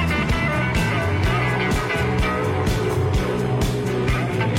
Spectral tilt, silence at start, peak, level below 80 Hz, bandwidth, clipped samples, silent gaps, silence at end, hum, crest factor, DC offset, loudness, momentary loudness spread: -6 dB/octave; 0 s; -12 dBFS; -30 dBFS; 16.5 kHz; under 0.1%; none; 0 s; none; 8 dB; under 0.1%; -21 LUFS; 2 LU